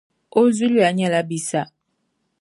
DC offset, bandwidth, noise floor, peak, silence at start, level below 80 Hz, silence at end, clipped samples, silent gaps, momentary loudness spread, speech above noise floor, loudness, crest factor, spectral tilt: under 0.1%; 11.5 kHz; -72 dBFS; -4 dBFS; 0.35 s; -70 dBFS; 0.75 s; under 0.1%; none; 9 LU; 54 dB; -19 LUFS; 16 dB; -5 dB/octave